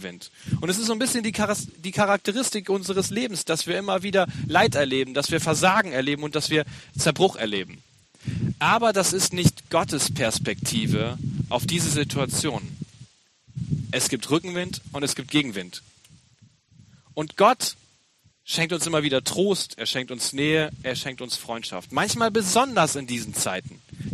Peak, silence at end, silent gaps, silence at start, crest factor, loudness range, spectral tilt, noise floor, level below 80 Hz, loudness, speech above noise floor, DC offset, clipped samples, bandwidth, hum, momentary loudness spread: -4 dBFS; 0 s; none; 0 s; 20 dB; 5 LU; -3.5 dB/octave; -62 dBFS; -56 dBFS; -24 LUFS; 38 dB; under 0.1%; under 0.1%; 14 kHz; none; 12 LU